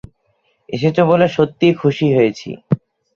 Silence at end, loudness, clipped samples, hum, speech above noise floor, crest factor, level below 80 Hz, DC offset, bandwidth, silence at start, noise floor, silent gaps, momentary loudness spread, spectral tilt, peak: 0.4 s; -16 LUFS; under 0.1%; none; 49 dB; 16 dB; -52 dBFS; under 0.1%; 7.2 kHz; 0.7 s; -63 dBFS; none; 9 LU; -7.5 dB/octave; -2 dBFS